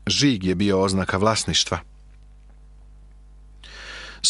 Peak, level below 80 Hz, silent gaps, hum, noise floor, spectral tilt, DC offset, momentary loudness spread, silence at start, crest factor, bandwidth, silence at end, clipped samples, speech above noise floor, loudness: -4 dBFS; -46 dBFS; none; 50 Hz at -45 dBFS; -47 dBFS; -4 dB/octave; under 0.1%; 18 LU; 0.05 s; 20 dB; 11.5 kHz; 0 s; under 0.1%; 26 dB; -21 LUFS